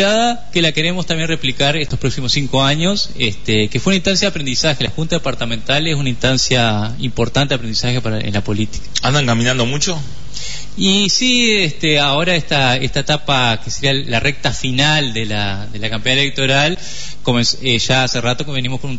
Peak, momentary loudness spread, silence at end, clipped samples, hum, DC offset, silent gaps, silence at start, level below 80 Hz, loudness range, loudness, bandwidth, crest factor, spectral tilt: 0 dBFS; 7 LU; 0 s; under 0.1%; none; 8%; none; 0 s; -36 dBFS; 3 LU; -15 LUFS; 8 kHz; 16 dB; -4 dB/octave